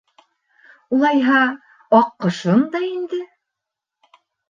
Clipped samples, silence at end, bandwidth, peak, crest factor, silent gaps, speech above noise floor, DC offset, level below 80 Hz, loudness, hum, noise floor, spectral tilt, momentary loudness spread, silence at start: under 0.1%; 1.25 s; 7.4 kHz; -2 dBFS; 18 dB; none; 67 dB; under 0.1%; -68 dBFS; -18 LUFS; none; -83 dBFS; -6.5 dB/octave; 13 LU; 0.9 s